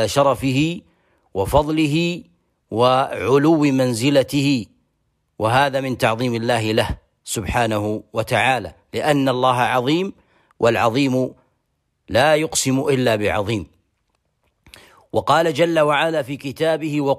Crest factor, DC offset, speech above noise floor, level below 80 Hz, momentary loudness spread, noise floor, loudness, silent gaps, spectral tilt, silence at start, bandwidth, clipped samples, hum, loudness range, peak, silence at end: 16 dB; under 0.1%; 53 dB; -44 dBFS; 10 LU; -71 dBFS; -19 LUFS; none; -5 dB/octave; 0 s; 15.5 kHz; under 0.1%; none; 3 LU; -4 dBFS; 0 s